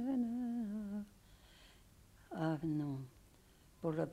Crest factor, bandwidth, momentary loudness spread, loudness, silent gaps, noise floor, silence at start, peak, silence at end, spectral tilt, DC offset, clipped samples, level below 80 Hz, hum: 18 dB; 15.5 kHz; 24 LU; -41 LUFS; none; -65 dBFS; 0 s; -24 dBFS; 0 s; -8.5 dB/octave; under 0.1%; under 0.1%; -68 dBFS; none